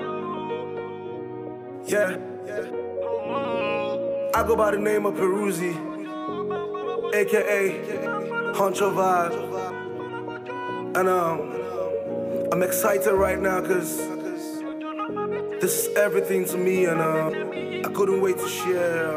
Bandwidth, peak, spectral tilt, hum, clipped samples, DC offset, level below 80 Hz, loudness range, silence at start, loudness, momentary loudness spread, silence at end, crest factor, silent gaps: 16.5 kHz; -8 dBFS; -4.5 dB/octave; none; under 0.1%; under 0.1%; -56 dBFS; 4 LU; 0 s; -25 LUFS; 11 LU; 0 s; 16 dB; none